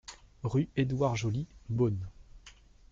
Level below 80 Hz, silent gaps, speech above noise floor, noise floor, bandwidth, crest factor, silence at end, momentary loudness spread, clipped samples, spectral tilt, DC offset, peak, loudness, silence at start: -54 dBFS; none; 25 dB; -56 dBFS; 7.8 kHz; 16 dB; 0.4 s; 10 LU; under 0.1%; -7 dB/octave; under 0.1%; -16 dBFS; -32 LUFS; 0.1 s